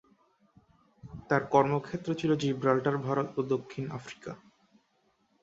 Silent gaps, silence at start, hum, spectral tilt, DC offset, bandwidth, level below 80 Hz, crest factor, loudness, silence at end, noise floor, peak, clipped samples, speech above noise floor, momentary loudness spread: none; 1.05 s; none; -7 dB/octave; under 0.1%; 8 kHz; -66 dBFS; 22 dB; -30 LUFS; 1.05 s; -72 dBFS; -8 dBFS; under 0.1%; 43 dB; 19 LU